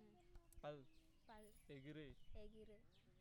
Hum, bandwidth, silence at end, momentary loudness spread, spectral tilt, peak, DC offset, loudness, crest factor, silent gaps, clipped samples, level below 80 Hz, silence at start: none; 17 kHz; 0 s; 9 LU; -6 dB/octave; -42 dBFS; under 0.1%; -61 LUFS; 18 dB; none; under 0.1%; -68 dBFS; 0 s